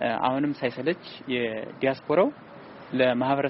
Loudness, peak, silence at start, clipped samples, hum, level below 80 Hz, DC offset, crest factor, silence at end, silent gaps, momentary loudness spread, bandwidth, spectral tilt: -26 LUFS; -8 dBFS; 0 s; under 0.1%; none; -66 dBFS; under 0.1%; 18 dB; 0 s; none; 11 LU; 5.8 kHz; -4 dB/octave